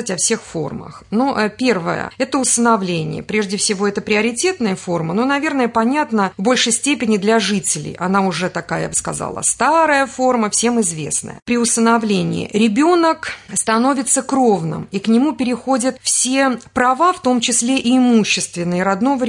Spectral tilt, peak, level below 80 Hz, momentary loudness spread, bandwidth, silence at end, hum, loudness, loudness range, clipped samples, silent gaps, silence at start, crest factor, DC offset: -3.5 dB/octave; -2 dBFS; -54 dBFS; 8 LU; 11 kHz; 0 s; none; -16 LUFS; 2 LU; under 0.1%; 11.42-11.46 s; 0 s; 14 dB; under 0.1%